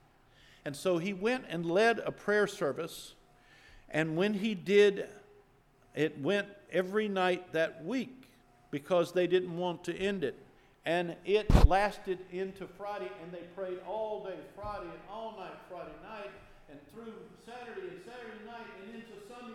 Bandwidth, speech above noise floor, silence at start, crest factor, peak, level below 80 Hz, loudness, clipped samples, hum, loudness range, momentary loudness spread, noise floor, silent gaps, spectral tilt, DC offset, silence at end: 15 kHz; 32 dB; 0.65 s; 26 dB; -6 dBFS; -40 dBFS; -32 LUFS; under 0.1%; none; 15 LU; 19 LU; -64 dBFS; none; -6 dB/octave; under 0.1%; 0 s